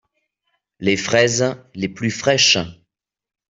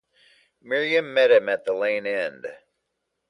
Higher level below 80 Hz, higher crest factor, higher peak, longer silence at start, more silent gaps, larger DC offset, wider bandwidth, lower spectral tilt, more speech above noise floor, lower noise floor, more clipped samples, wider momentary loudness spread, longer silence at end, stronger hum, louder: first, -56 dBFS vs -76 dBFS; about the same, 20 dB vs 18 dB; first, -2 dBFS vs -6 dBFS; first, 0.8 s vs 0.65 s; neither; neither; second, 8 kHz vs 10.5 kHz; second, -3 dB/octave vs -4.5 dB/octave; about the same, 55 dB vs 56 dB; second, -73 dBFS vs -78 dBFS; neither; about the same, 13 LU vs 13 LU; about the same, 0.75 s vs 0.75 s; neither; first, -17 LUFS vs -22 LUFS